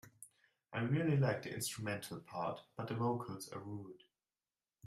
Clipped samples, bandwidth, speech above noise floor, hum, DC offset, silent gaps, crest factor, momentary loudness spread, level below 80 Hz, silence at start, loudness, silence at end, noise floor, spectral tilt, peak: under 0.1%; 15.5 kHz; over 51 dB; none; under 0.1%; none; 18 dB; 17 LU; -74 dBFS; 0.05 s; -40 LUFS; 0 s; under -90 dBFS; -5.5 dB/octave; -22 dBFS